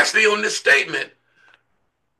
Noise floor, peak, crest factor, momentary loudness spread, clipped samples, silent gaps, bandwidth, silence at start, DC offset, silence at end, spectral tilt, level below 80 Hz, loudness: -71 dBFS; -4 dBFS; 18 dB; 12 LU; under 0.1%; none; 12.5 kHz; 0 s; under 0.1%; 1.1 s; -0.5 dB/octave; -74 dBFS; -17 LUFS